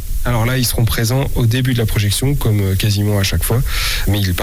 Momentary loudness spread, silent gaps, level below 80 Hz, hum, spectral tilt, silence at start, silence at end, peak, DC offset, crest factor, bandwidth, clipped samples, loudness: 2 LU; none; -22 dBFS; none; -5 dB/octave; 0 s; 0 s; -6 dBFS; under 0.1%; 8 dB; 18 kHz; under 0.1%; -16 LUFS